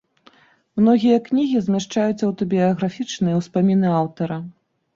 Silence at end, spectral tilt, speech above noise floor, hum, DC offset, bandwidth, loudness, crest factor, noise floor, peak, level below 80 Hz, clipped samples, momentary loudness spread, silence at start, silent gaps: 0.45 s; -7 dB/octave; 35 dB; none; under 0.1%; 7.6 kHz; -20 LUFS; 16 dB; -54 dBFS; -4 dBFS; -58 dBFS; under 0.1%; 10 LU; 0.75 s; none